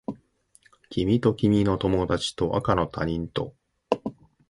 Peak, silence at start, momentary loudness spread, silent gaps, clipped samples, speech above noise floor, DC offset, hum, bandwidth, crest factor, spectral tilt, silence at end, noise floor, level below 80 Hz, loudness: -4 dBFS; 0.1 s; 13 LU; none; under 0.1%; 37 dB; under 0.1%; none; 11.5 kHz; 22 dB; -6.5 dB/octave; 0.4 s; -61 dBFS; -44 dBFS; -25 LUFS